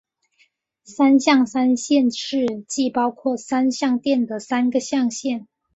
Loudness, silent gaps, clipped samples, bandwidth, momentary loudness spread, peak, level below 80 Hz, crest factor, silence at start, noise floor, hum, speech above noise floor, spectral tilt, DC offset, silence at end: -20 LUFS; none; under 0.1%; 8.2 kHz; 8 LU; -4 dBFS; -66 dBFS; 16 dB; 0.9 s; -63 dBFS; none; 43 dB; -3.5 dB/octave; under 0.1%; 0.3 s